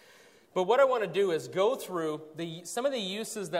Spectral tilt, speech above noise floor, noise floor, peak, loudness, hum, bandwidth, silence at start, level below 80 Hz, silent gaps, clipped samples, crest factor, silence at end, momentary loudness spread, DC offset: -4 dB/octave; 29 dB; -58 dBFS; -12 dBFS; -30 LUFS; none; 16 kHz; 0.55 s; -82 dBFS; none; under 0.1%; 18 dB; 0 s; 12 LU; under 0.1%